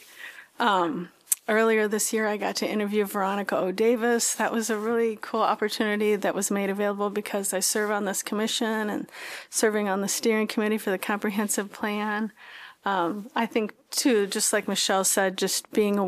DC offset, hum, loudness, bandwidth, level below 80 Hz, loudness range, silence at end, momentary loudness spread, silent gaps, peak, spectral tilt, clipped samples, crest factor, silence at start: under 0.1%; none; -25 LUFS; 15.5 kHz; -76 dBFS; 3 LU; 0 s; 7 LU; none; -2 dBFS; -3 dB/octave; under 0.1%; 24 dB; 0.1 s